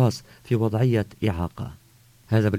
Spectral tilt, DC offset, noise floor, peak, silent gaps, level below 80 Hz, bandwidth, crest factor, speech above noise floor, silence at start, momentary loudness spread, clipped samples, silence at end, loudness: -7.5 dB/octave; under 0.1%; -55 dBFS; -8 dBFS; none; -44 dBFS; 16 kHz; 16 dB; 31 dB; 0 s; 16 LU; under 0.1%; 0 s; -25 LUFS